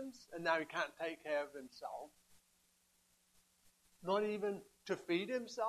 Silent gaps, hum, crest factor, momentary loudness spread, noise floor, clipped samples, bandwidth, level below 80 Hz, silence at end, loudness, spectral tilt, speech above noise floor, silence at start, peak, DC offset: none; none; 22 dB; 12 LU; -76 dBFS; under 0.1%; 14 kHz; -82 dBFS; 0 s; -41 LUFS; -4.5 dB/octave; 35 dB; 0 s; -20 dBFS; under 0.1%